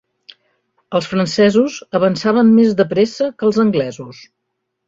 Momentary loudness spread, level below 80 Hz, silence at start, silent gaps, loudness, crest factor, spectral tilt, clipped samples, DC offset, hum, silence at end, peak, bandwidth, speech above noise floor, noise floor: 10 LU; -56 dBFS; 0.9 s; none; -15 LUFS; 14 dB; -6 dB/octave; under 0.1%; under 0.1%; none; 0.75 s; -2 dBFS; 7.8 kHz; 60 dB; -74 dBFS